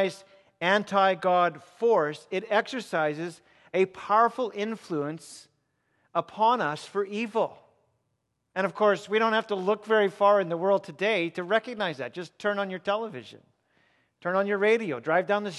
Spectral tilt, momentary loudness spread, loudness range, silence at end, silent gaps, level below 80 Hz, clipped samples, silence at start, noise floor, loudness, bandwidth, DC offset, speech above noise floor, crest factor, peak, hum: -5 dB/octave; 10 LU; 5 LU; 0 s; none; -80 dBFS; under 0.1%; 0 s; -77 dBFS; -27 LUFS; 12 kHz; under 0.1%; 51 dB; 20 dB; -8 dBFS; none